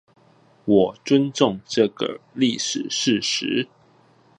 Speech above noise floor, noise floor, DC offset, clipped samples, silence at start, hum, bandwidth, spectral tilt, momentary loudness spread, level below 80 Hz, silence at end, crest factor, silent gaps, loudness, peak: 35 dB; -56 dBFS; under 0.1%; under 0.1%; 0.65 s; none; 11 kHz; -4 dB/octave; 9 LU; -62 dBFS; 0.75 s; 20 dB; none; -21 LUFS; -2 dBFS